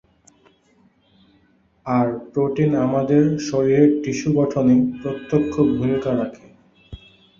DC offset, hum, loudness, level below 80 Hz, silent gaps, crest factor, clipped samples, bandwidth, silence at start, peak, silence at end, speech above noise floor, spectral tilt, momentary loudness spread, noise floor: under 0.1%; none; -19 LUFS; -50 dBFS; none; 18 dB; under 0.1%; 7.4 kHz; 1.85 s; -4 dBFS; 0.45 s; 40 dB; -7.5 dB/octave; 7 LU; -59 dBFS